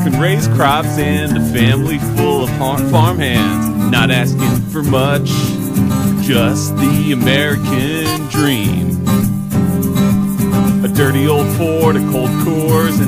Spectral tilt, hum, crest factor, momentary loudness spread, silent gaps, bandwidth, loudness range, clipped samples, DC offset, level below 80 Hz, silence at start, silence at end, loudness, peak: -6 dB/octave; none; 12 dB; 3 LU; none; 16 kHz; 1 LU; under 0.1%; under 0.1%; -34 dBFS; 0 s; 0 s; -14 LUFS; -2 dBFS